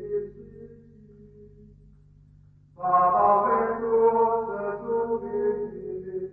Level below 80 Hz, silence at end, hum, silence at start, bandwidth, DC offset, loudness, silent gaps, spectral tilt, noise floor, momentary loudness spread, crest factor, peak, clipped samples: -58 dBFS; 0 s; 50 Hz at -65 dBFS; 0 s; 2.9 kHz; under 0.1%; -24 LUFS; none; -10.5 dB/octave; -54 dBFS; 14 LU; 16 dB; -10 dBFS; under 0.1%